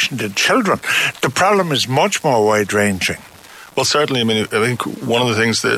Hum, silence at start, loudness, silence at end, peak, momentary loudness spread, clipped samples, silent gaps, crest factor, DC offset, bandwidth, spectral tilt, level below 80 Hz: none; 0 s; -16 LUFS; 0 s; -4 dBFS; 5 LU; under 0.1%; none; 12 dB; under 0.1%; 16 kHz; -3.5 dB/octave; -50 dBFS